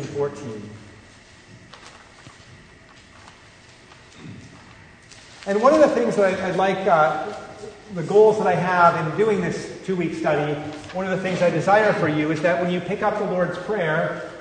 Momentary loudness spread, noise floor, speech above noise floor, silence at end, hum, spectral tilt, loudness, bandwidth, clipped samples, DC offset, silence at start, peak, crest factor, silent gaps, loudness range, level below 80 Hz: 18 LU; -48 dBFS; 28 dB; 0 s; none; -6 dB/octave; -20 LUFS; 9.6 kHz; under 0.1%; under 0.1%; 0 s; -2 dBFS; 20 dB; none; 5 LU; -58 dBFS